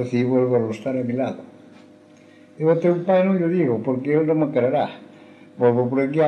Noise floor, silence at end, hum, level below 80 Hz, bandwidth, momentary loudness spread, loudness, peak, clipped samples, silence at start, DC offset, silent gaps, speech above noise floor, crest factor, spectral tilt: -49 dBFS; 0 s; none; -70 dBFS; 8.4 kHz; 7 LU; -21 LUFS; -6 dBFS; under 0.1%; 0 s; under 0.1%; none; 29 dB; 16 dB; -9 dB/octave